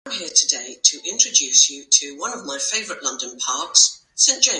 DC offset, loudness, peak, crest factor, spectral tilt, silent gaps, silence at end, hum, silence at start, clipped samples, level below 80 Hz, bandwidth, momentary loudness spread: under 0.1%; -17 LUFS; 0 dBFS; 20 dB; 2.5 dB/octave; none; 0 s; none; 0.05 s; under 0.1%; -74 dBFS; 11.5 kHz; 11 LU